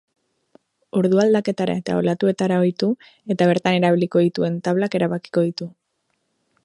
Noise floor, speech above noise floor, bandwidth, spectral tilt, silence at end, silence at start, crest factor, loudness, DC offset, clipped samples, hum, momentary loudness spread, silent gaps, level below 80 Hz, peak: -72 dBFS; 53 dB; 11 kHz; -7 dB/octave; 0.95 s; 0.95 s; 18 dB; -20 LUFS; under 0.1%; under 0.1%; none; 7 LU; none; -64 dBFS; -2 dBFS